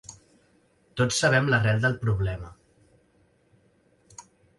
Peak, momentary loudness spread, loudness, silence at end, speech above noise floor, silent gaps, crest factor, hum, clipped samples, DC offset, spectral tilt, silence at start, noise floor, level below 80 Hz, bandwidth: -8 dBFS; 27 LU; -24 LUFS; 0.35 s; 40 dB; none; 20 dB; none; under 0.1%; under 0.1%; -5 dB/octave; 0.1 s; -64 dBFS; -48 dBFS; 11.5 kHz